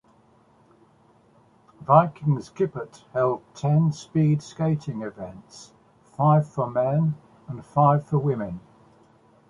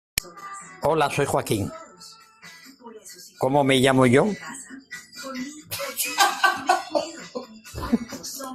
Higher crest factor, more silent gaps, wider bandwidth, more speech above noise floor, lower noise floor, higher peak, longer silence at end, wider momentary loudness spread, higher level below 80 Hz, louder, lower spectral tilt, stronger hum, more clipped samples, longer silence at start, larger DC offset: about the same, 22 dB vs 22 dB; neither; second, 7.6 kHz vs 16 kHz; first, 35 dB vs 26 dB; first, -58 dBFS vs -48 dBFS; about the same, -2 dBFS vs -2 dBFS; first, 0.9 s vs 0 s; second, 20 LU vs 24 LU; second, -60 dBFS vs -52 dBFS; about the same, -23 LUFS vs -23 LUFS; first, -9 dB/octave vs -4 dB/octave; neither; neither; first, 1.8 s vs 0.15 s; neither